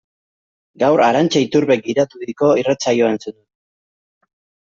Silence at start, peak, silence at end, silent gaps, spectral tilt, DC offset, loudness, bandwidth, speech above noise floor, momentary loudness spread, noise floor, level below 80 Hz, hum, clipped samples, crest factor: 0.8 s; -2 dBFS; 1.4 s; none; -5 dB/octave; under 0.1%; -16 LUFS; 7.8 kHz; over 74 dB; 7 LU; under -90 dBFS; -60 dBFS; none; under 0.1%; 16 dB